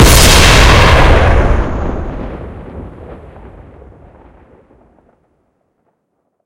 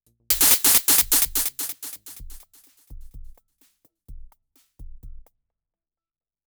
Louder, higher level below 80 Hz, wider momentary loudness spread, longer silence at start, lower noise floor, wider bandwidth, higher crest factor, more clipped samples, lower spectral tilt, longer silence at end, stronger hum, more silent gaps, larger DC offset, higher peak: first, -8 LUFS vs -17 LUFS; first, -16 dBFS vs -44 dBFS; first, 25 LU vs 21 LU; second, 0 s vs 0.3 s; second, -66 dBFS vs under -90 dBFS; about the same, over 20 kHz vs over 20 kHz; second, 12 dB vs 22 dB; first, 1% vs under 0.1%; first, -4 dB/octave vs 0.5 dB/octave; first, 3.3 s vs 1.3 s; neither; neither; neither; first, 0 dBFS vs -4 dBFS